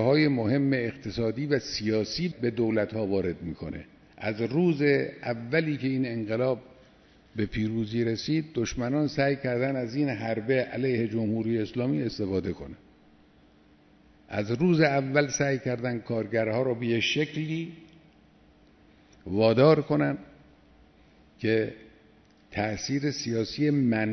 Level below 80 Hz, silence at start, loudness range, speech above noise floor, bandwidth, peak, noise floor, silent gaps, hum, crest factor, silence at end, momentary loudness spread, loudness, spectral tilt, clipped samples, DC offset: -56 dBFS; 0 s; 4 LU; 32 dB; 6.4 kHz; -8 dBFS; -58 dBFS; none; none; 20 dB; 0 s; 11 LU; -27 LUFS; -6 dB/octave; under 0.1%; under 0.1%